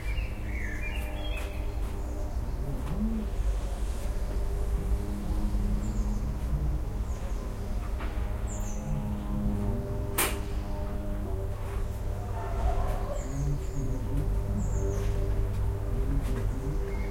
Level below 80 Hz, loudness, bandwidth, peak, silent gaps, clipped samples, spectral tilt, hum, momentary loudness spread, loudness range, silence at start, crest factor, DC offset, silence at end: -32 dBFS; -33 LUFS; 16.5 kHz; -12 dBFS; none; under 0.1%; -6 dB/octave; none; 5 LU; 2 LU; 0 s; 18 dB; under 0.1%; 0 s